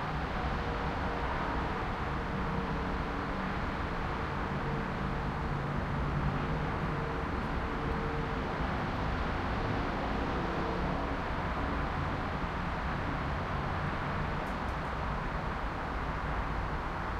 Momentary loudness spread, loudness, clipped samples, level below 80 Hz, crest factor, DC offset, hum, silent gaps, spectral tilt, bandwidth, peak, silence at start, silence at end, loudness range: 2 LU; -34 LUFS; under 0.1%; -40 dBFS; 14 dB; under 0.1%; none; none; -7 dB/octave; 10.5 kHz; -20 dBFS; 0 s; 0 s; 1 LU